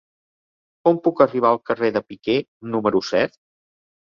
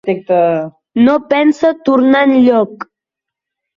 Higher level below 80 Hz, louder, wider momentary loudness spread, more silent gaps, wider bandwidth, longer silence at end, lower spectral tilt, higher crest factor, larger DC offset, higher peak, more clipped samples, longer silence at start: second, -62 dBFS vs -56 dBFS; second, -21 LUFS vs -12 LUFS; second, 7 LU vs 12 LU; first, 2.48-2.60 s vs none; about the same, 7.2 kHz vs 7.4 kHz; about the same, 0.9 s vs 0.95 s; about the same, -6 dB/octave vs -7 dB/octave; first, 20 dB vs 12 dB; neither; about the same, -2 dBFS vs -2 dBFS; neither; first, 0.85 s vs 0.05 s